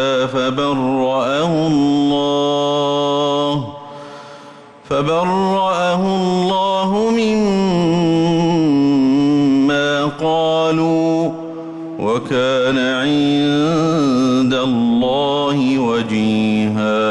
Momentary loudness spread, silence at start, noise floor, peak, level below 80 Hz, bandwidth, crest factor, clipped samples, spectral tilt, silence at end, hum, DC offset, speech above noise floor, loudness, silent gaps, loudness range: 6 LU; 0 s; -39 dBFS; -8 dBFS; -50 dBFS; 10.5 kHz; 8 dB; under 0.1%; -6 dB/octave; 0 s; none; under 0.1%; 24 dB; -16 LUFS; none; 4 LU